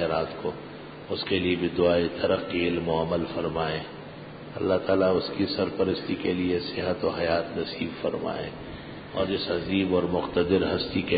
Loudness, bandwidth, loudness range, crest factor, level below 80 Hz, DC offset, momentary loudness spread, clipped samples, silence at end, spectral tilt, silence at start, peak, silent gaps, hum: -27 LUFS; 5 kHz; 3 LU; 16 dB; -48 dBFS; under 0.1%; 14 LU; under 0.1%; 0 s; -10.5 dB/octave; 0 s; -10 dBFS; none; none